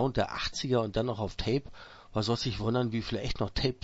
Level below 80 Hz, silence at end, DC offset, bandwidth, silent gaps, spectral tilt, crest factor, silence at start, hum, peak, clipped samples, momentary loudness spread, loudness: -44 dBFS; 0.1 s; under 0.1%; 8 kHz; none; -5.5 dB/octave; 18 dB; 0 s; none; -14 dBFS; under 0.1%; 5 LU; -32 LUFS